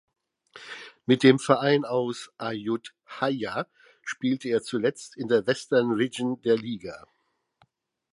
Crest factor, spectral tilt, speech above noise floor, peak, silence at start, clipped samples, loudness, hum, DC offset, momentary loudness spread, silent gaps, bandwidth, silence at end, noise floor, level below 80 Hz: 24 dB; -5.5 dB/octave; 45 dB; -4 dBFS; 0.55 s; under 0.1%; -26 LUFS; none; under 0.1%; 20 LU; none; 11.5 kHz; 1.15 s; -70 dBFS; -70 dBFS